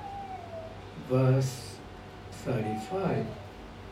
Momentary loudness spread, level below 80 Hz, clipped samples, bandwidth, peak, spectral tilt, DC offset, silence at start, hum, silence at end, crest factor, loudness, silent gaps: 19 LU; -54 dBFS; under 0.1%; 14 kHz; -16 dBFS; -7 dB/octave; under 0.1%; 0 s; 50 Hz at -50 dBFS; 0 s; 16 dB; -31 LUFS; none